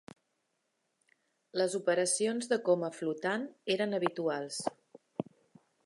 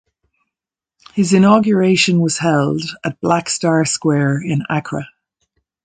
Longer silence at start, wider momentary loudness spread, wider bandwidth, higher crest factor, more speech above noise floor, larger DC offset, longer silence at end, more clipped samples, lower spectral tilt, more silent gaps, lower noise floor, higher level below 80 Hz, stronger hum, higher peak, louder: first, 1.55 s vs 1.15 s; about the same, 13 LU vs 12 LU; first, 11.5 kHz vs 9.6 kHz; first, 22 dB vs 16 dB; second, 48 dB vs 72 dB; neither; second, 0.65 s vs 0.8 s; neither; second, -3.5 dB/octave vs -5 dB/octave; neither; second, -80 dBFS vs -87 dBFS; second, -84 dBFS vs -56 dBFS; neither; second, -14 dBFS vs 0 dBFS; second, -33 LUFS vs -16 LUFS